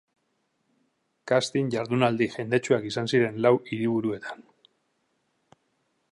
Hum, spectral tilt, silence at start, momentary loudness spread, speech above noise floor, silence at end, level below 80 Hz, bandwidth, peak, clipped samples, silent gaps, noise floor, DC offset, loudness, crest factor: none; -6 dB/octave; 1.25 s; 11 LU; 49 dB; 1.7 s; -68 dBFS; 11 kHz; -6 dBFS; under 0.1%; none; -74 dBFS; under 0.1%; -25 LUFS; 22 dB